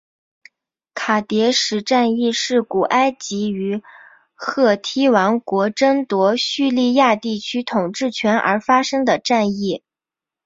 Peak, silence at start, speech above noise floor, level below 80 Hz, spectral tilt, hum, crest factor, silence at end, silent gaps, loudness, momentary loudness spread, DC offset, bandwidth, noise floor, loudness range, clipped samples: -2 dBFS; 0.95 s; 71 dB; -64 dBFS; -4 dB/octave; none; 18 dB; 0.7 s; none; -18 LUFS; 8 LU; under 0.1%; 7.8 kHz; -88 dBFS; 2 LU; under 0.1%